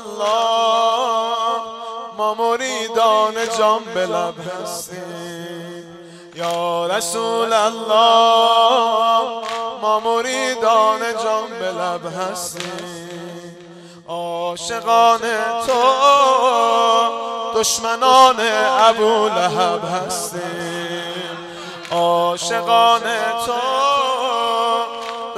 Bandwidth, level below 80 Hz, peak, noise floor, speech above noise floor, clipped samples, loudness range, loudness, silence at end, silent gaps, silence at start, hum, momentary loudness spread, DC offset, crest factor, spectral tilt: 15.5 kHz; -62 dBFS; 0 dBFS; -40 dBFS; 23 dB; under 0.1%; 8 LU; -17 LUFS; 0 s; none; 0 s; none; 16 LU; under 0.1%; 18 dB; -2 dB/octave